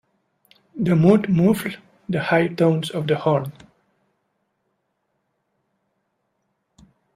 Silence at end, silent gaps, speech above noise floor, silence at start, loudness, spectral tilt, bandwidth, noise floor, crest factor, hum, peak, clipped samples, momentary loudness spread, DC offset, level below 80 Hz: 3.65 s; none; 54 dB; 0.75 s; -20 LUFS; -7.5 dB/octave; 15.5 kHz; -73 dBFS; 22 dB; none; -2 dBFS; under 0.1%; 15 LU; under 0.1%; -60 dBFS